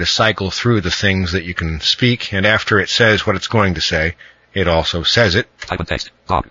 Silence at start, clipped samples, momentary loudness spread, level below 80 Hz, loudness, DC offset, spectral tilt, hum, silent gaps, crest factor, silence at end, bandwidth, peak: 0 s; under 0.1%; 9 LU; -34 dBFS; -16 LUFS; under 0.1%; -4.5 dB/octave; none; none; 16 dB; 0.1 s; 7.6 kHz; 0 dBFS